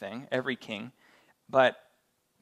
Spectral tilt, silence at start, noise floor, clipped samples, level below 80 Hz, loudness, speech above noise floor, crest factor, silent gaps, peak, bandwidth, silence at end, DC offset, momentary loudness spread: -5.5 dB/octave; 0 s; -73 dBFS; under 0.1%; -80 dBFS; -29 LUFS; 43 dB; 24 dB; none; -8 dBFS; 11 kHz; 0.7 s; under 0.1%; 15 LU